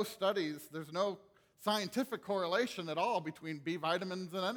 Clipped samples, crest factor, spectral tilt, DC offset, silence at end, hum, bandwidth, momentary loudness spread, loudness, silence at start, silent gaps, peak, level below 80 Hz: under 0.1%; 18 dB; -4.5 dB/octave; under 0.1%; 0 s; none; over 20 kHz; 8 LU; -37 LUFS; 0 s; none; -18 dBFS; -82 dBFS